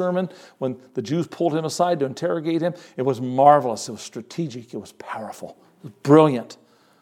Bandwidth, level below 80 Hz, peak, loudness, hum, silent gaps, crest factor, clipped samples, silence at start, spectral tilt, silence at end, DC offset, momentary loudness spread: 15 kHz; -76 dBFS; 0 dBFS; -21 LUFS; none; none; 22 dB; under 0.1%; 0 s; -6.5 dB/octave; 0.5 s; under 0.1%; 20 LU